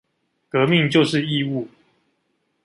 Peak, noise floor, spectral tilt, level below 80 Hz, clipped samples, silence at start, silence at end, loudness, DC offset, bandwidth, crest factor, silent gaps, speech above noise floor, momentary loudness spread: -4 dBFS; -70 dBFS; -6 dB/octave; -62 dBFS; under 0.1%; 0.55 s; 1 s; -19 LUFS; under 0.1%; 11.5 kHz; 18 dB; none; 51 dB; 12 LU